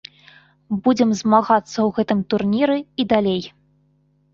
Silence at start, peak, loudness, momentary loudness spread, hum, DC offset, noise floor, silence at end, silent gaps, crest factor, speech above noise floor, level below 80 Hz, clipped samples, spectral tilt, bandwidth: 0.7 s; -2 dBFS; -19 LUFS; 7 LU; 50 Hz at -45 dBFS; under 0.1%; -61 dBFS; 0.85 s; none; 18 dB; 43 dB; -58 dBFS; under 0.1%; -6 dB/octave; 7.4 kHz